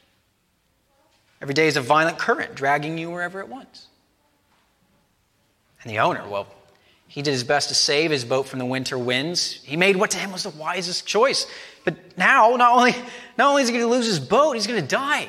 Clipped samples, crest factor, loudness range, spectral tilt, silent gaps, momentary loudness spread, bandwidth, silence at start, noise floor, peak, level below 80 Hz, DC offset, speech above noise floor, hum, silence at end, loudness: under 0.1%; 20 dB; 12 LU; -3 dB/octave; none; 13 LU; 15.5 kHz; 1.4 s; -67 dBFS; -2 dBFS; -68 dBFS; under 0.1%; 46 dB; none; 0 s; -21 LUFS